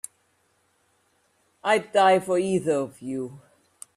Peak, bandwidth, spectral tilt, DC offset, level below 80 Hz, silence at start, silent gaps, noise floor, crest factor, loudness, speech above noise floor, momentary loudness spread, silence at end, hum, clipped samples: -8 dBFS; 14 kHz; -4.5 dB/octave; under 0.1%; -70 dBFS; 1.65 s; none; -68 dBFS; 18 dB; -24 LUFS; 45 dB; 14 LU; 0.6 s; none; under 0.1%